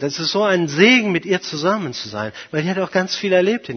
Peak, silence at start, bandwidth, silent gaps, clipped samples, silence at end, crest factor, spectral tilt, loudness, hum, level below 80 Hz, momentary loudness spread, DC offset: 0 dBFS; 0 s; 6.6 kHz; none; under 0.1%; 0 s; 18 dB; -4.5 dB/octave; -18 LUFS; none; -62 dBFS; 13 LU; under 0.1%